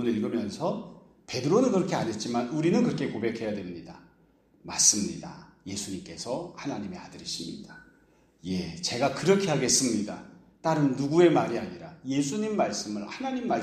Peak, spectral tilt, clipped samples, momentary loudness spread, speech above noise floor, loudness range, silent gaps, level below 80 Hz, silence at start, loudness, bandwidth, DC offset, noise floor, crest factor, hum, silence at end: -6 dBFS; -4 dB/octave; under 0.1%; 18 LU; 35 dB; 9 LU; none; -64 dBFS; 0 s; -27 LUFS; 15 kHz; under 0.1%; -62 dBFS; 22 dB; none; 0 s